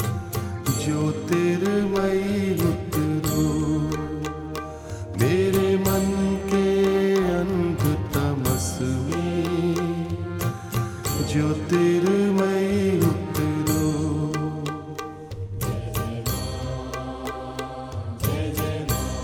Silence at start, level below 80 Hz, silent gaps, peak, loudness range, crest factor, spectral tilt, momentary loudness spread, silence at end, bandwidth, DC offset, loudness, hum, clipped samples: 0 s; -40 dBFS; none; -6 dBFS; 7 LU; 18 dB; -6 dB/octave; 12 LU; 0 s; 19.5 kHz; under 0.1%; -24 LUFS; none; under 0.1%